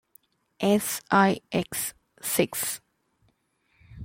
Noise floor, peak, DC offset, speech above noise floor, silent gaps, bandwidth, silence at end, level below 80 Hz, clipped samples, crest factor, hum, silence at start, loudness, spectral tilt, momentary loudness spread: -70 dBFS; -8 dBFS; under 0.1%; 45 dB; none; 16.5 kHz; 0 s; -62 dBFS; under 0.1%; 22 dB; none; 0.6 s; -26 LUFS; -4 dB/octave; 11 LU